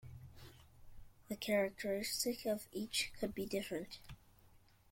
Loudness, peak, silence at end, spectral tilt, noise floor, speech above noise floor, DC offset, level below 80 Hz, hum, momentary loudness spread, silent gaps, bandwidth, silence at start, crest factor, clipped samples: -40 LUFS; -24 dBFS; 0.35 s; -3 dB/octave; -66 dBFS; 26 dB; under 0.1%; -64 dBFS; none; 22 LU; none; 16.5 kHz; 0.05 s; 20 dB; under 0.1%